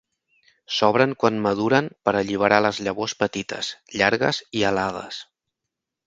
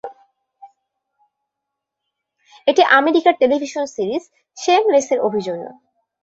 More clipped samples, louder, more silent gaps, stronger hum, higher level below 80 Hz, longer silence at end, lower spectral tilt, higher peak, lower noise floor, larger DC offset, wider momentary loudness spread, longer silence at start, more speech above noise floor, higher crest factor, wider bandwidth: neither; second, -22 LUFS vs -17 LUFS; neither; neither; first, -58 dBFS vs -66 dBFS; first, 0.85 s vs 0.5 s; about the same, -4.5 dB/octave vs -3.5 dB/octave; about the same, 0 dBFS vs -2 dBFS; about the same, -84 dBFS vs -81 dBFS; neither; second, 10 LU vs 15 LU; first, 0.7 s vs 0.05 s; about the same, 62 dB vs 64 dB; about the same, 22 dB vs 18 dB; first, 9 kHz vs 8 kHz